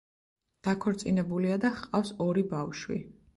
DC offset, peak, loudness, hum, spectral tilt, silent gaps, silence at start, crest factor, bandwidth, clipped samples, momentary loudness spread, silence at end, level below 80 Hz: under 0.1%; -16 dBFS; -31 LUFS; none; -6.5 dB/octave; none; 0.65 s; 14 dB; 11.5 kHz; under 0.1%; 8 LU; 0.25 s; -62 dBFS